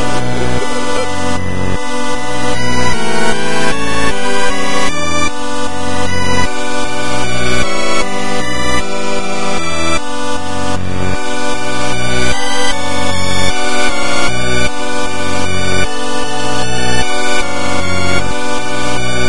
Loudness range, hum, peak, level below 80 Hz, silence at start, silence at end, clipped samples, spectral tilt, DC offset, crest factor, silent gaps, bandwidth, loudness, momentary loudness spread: 2 LU; none; 0 dBFS; -30 dBFS; 0 s; 0 s; under 0.1%; -3.5 dB/octave; 40%; 16 dB; none; 11.5 kHz; -16 LUFS; 4 LU